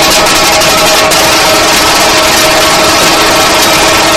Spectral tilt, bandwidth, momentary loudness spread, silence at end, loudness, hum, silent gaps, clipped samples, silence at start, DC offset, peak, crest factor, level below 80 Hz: -1.5 dB/octave; over 20 kHz; 0 LU; 0 s; -4 LUFS; none; none; 2%; 0 s; 0.9%; 0 dBFS; 6 dB; -28 dBFS